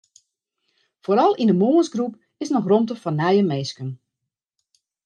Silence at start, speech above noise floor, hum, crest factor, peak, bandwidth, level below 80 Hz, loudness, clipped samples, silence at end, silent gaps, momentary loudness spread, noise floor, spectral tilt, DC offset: 1.1 s; 64 dB; none; 16 dB; -6 dBFS; 9.4 kHz; -72 dBFS; -20 LUFS; under 0.1%; 1.1 s; none; 16 LU; -83 dBFS; -7 dB/octave; under 0.1%